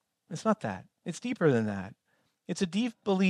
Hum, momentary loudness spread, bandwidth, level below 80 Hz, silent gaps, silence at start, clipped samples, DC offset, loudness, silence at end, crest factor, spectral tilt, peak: none; 15 LU; 11 kHz; -72 dBFS; none; 0.3 s; under 0.1%; under 0.1%; -31 LUFS; 0 s; 18 dB; -6 dB/octave; -12 dBFS